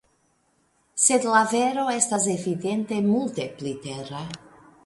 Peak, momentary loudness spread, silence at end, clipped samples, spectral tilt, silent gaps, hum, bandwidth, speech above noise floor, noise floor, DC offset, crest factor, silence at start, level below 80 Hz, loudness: -4 dBFS; 15 LU; 0.5 s; under 0.1%; -3.5 dB/octave; none; none; 11.5 kHz; 43 dB; -67 dBFS; under 0.1%; 22 dB; 0.95 s; -66 dBFS; -23 LUFS